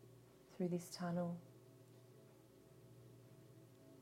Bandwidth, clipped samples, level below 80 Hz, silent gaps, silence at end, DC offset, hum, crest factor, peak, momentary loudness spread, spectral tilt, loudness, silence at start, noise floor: 16 kHz; under 0.1%; -84 dBFS; none; 0 s; under 0.1%; none; 18 dB; -32 dBFS; 22 LU; -6.5 dB/octave; -45 LUFS; 0 s; -65 dBFS